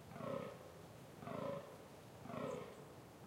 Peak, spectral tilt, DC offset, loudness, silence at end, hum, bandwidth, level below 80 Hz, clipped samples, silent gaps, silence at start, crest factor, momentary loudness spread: -32 dBFS; -6 dB/octave; under 0.1%; -50 LUFS; 0 s; none; 16 kHz; -76 dBFS; under 0.1%; none; 0 s; 18 dB; 11 LU